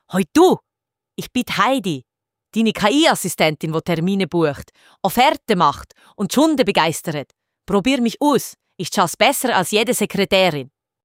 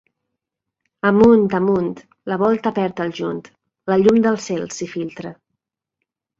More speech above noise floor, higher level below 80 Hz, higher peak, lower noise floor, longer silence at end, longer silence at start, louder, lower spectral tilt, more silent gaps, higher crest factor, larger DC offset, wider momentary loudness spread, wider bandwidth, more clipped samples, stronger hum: about the same, 62 dB vs 64 dB; about the same, -52 dBFS vs -54 dBFS; about the same, -2 dBFS vs -2 dBFS; about the same, -80 dBFS vs -82 dBFS; second, 0.4 s vs 1.05 s; second, 0.1 s vs 1.05 s; about the same, -18 LUFS vs -18 LUFS; second, -4 dB/octave vs -6.5 dB/octave; neither; about the same, 18 dB vs 18 dB; neither; second, 12 LU vs 18 LU; first, 16.5 kHz vs 7.8 kHz; neither; neither